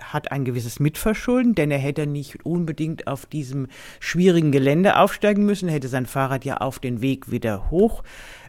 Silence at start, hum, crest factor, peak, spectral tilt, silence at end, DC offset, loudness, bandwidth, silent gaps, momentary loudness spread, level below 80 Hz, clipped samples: 0 s; none; 20 dB; -2 dBFS; -6.5 dB/octave; 0 s; under 0.1%; -22 LUFS; 17 kHz; none; 12 LU; -40 dBFS; under 0.1%